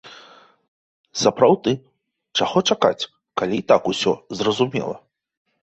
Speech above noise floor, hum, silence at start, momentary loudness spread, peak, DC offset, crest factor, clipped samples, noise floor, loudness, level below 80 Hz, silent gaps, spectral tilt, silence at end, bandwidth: 30 dB; none; 0.05 s; 12 LU; -2 dBFS; under 0.1%; 20 dB; under 0.1%; -49 dBFS; -20 LUFS; -60 dBFS; 0.68-1.04 s; -4.5 dB/octave; 0.8 s; 8.2 kHz